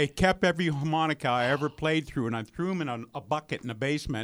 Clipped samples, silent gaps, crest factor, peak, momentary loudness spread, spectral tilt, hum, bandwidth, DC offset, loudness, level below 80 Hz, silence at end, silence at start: under 0.1%; none; 18 dB; -10 dBFS; 8 LU; -6 dB/octave; none; 19.5 kHz; under 0.1%; -29 LUFS; -50 dBFS; 0 s; 0 s